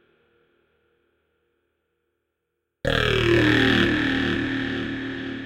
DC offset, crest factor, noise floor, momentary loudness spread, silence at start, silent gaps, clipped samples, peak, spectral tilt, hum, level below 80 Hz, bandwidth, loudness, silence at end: under 0.1%; 20 dB; -79 dBFS; 12 LU; 2.85 s; none; under 0.1%; -4 dBFS; -6 dB/octave; none; -42 dBFS; 16.5 kHz; -22 LUFS; 0 s